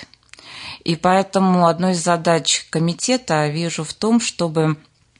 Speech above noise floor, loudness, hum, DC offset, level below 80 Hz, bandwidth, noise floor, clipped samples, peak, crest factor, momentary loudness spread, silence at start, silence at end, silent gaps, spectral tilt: 26 dB; -18 LUFS; none; under 0.1%; -58 dBFS; 11 kHz; -43 dBFS; under 0.1%; -4 dBFS; 16 dB; 10 LU; 0 s; 0.45 s; none; -4.5 dB/octave